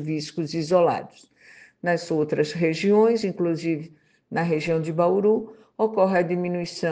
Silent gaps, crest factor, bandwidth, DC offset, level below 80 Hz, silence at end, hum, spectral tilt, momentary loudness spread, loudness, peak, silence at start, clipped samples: none; 18 dB; 9.4 kHz; under 0.1%; -66 dBFS; 0 s; none; -6.5 dB/octave; 9 LU; -23 LUFS; -6 dBFS; 0 s; under 0.1%